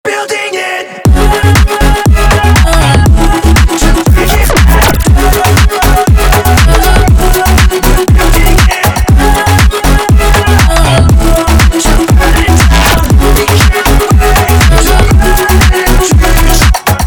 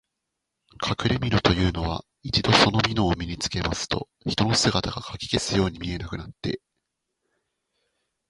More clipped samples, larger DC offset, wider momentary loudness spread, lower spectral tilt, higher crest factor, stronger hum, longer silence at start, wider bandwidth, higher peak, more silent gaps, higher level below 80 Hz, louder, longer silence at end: first, 1% vs under 0.1%; neither; second, 2 LU vs 13 LU; about the same, -4.5 dB/octave vs -4.5 dB/octave; second, 6 dB vs 24 dB; neither; second, 0.05 s vs 0.8 s; first, over 20 kHz vs 11.5 kHz; about the same, 0 dBFS vs -2 dBFS; neither; first, -8 dBFS vs -40 dBFS; first, -7 LUFS vs -24 LUFS; second, 0 s vs 1.7 s